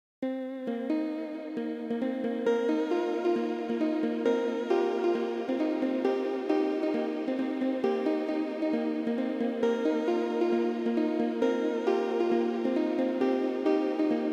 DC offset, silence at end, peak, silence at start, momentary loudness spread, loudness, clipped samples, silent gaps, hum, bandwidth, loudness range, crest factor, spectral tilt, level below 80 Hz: under 0.1%; 0 s; -14 dBFS; 0.2 s; 4 LU; -29 LUFS; under 0.1%; none; none; 8.2 kHz; 2 LU; 14 dB; -6 dB/octave; -84 dBFS